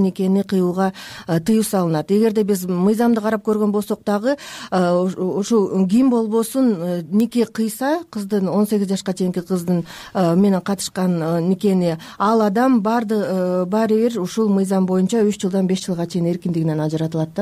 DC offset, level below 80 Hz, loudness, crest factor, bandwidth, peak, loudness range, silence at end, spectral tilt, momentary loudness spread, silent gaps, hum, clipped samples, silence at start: under 0.1%; -60 dBFS; -19 LUFS; 10 dB; 15.5 kHz; -8 dBFS; 2 LU; 0 s; -6.5 dB/octave; 6 LU; none; none; under 0.1%; 0 s